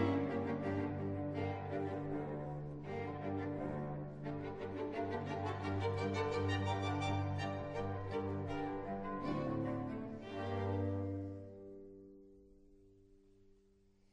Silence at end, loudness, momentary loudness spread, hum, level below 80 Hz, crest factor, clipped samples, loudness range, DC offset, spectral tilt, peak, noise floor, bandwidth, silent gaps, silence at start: 0.95 s; -41 LUFS; 8 LU; none; -62 dBFS; 18 dB; under 0.1%; 6 LU; under 0.1%; -7.5 dB/octave; -24 dBFS; -69 dBFS; 8.8 kHz; none; 0 s